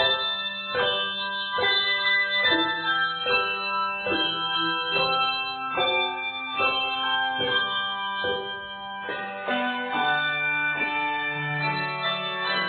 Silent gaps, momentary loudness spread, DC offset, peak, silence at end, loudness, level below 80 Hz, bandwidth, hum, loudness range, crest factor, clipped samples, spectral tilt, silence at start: none; 7 LU; under 0.1%; -10 dBFS; 0 s; -24 LUFS; -64 dBFS; 4.7 kHz; none; 4 LU; 16 dB; under 0.1%; -7 dB/octave; 0 s